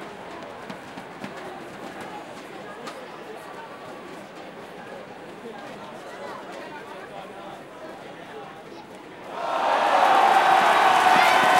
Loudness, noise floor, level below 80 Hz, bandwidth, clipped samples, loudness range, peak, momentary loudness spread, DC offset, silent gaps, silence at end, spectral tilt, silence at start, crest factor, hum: -18 LUFS; -41 dBFS; -68 dBFS; 16 kHz; under 0.1%; 18 LU; -4 dBFS; 23 LU; under 0.1%; none; 0 s; -2.5 dB/octave; 0 s; 20 dB; none